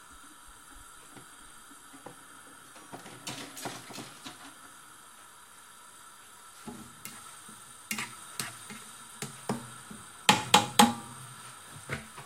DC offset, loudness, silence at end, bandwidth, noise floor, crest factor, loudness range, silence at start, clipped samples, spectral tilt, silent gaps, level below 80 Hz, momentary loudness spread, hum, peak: under 0.1%; -30 LUFS; 0 s; 16 kHz; -53 dBFS; 34 dB; 19 LU; 0 s; under 0.1%; -2.5 dB/octave; none; -66 dBFS; 25 LU; none; -2 dBFS